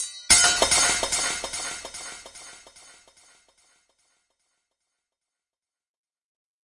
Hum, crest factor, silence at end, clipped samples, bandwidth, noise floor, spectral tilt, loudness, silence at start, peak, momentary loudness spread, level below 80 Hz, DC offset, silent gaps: none; 26 dB; 4.2 s; under 0.1%; 11.5 kHz; under -90 dBFS; 0.5 dB/octave; -20 LUFS; 0 s; -2 dBFS; 24 LU; -54 dBFS; under 0.1%; none